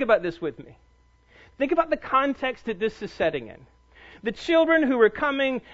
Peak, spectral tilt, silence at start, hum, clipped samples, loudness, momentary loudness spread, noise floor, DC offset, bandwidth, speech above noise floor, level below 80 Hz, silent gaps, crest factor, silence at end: -6 dBFS; -5.5 dB/octave; 0 s; none; under 0.1%; -24 LUFS; 14 LU; -58 dBFS; under 0.1%; 8 kHz; 34 dB; -54 dBFS; none; 20 dB; 0 s